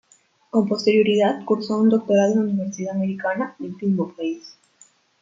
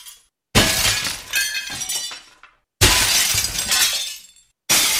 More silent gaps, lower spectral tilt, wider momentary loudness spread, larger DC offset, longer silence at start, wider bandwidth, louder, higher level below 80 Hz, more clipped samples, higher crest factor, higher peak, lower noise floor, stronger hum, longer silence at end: neither; first, -6.5 dB/octave vs -1 dB/octave; second, 10 LU vs 15 LU; neither; first, 0.55 s vs 0.05 s; second, 7.6 kHz vs over 20 kHz; second, -21 LUFS vs -17 LUFS; second, -68 dBFS vs -36 dBFS; neither; about the same, 16 dB vs 20 dB; second, -6 dBFS vs 0 dBFS; first, -59 dBFS vs -52 dBFS; neither; first, 0.7 s vs 0 s